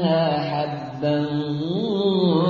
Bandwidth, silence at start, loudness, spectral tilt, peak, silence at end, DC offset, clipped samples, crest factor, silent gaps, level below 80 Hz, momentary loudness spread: 7 kHz; 0 s; -23 LUFS; -8.5 dB/octave; -8 dBFS; 0 s; under 0.1%; under 0.1%; 12 dB; none; -60 dBFS; 6 LU